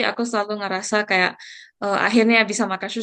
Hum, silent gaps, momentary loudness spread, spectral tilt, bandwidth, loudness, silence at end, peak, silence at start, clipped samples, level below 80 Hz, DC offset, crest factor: none; none; 11 LU; -3.5 dB/octave; 10 kHz; -20 LUFS; 0 s; -2 dBFS; 0 s; under 0.1%; -70 dBFS; under 0.1%; 18 dB